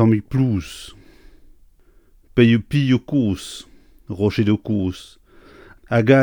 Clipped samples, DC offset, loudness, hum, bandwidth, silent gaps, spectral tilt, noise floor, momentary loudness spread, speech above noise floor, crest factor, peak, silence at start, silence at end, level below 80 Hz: under 0.1%; under 0.1%; -19 LUFS; none; 17.5 kHz; none; -7.5 dB/octave; -52 dBFS; 19 LU; 34 dB; 18 dB; -2 dBFS; 0 s; 0 s; -46 dBFS